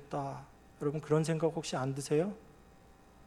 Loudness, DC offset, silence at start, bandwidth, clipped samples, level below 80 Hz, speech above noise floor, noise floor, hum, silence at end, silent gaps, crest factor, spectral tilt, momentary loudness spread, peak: -34 LUFS; under 0.1%; 0 s; 13 kHz; under 0.1%; -64 dBFS; 26 dB; -59 dBFS; none; 0.05 s; none; 18 dB; -6 dB/octave; 11 LU; -16 dBFS